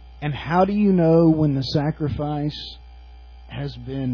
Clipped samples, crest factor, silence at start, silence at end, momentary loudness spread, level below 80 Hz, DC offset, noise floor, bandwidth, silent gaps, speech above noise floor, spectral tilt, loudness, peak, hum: under 0.1%; 16 dB; 0 s; 0 s; 16 LU; -42 dBFS; under 0.1%; -42 dBFS; 5.4 kHz; none; 22 dB; -8.5 dB/octave; -20 LUFS; -6 dBFS; none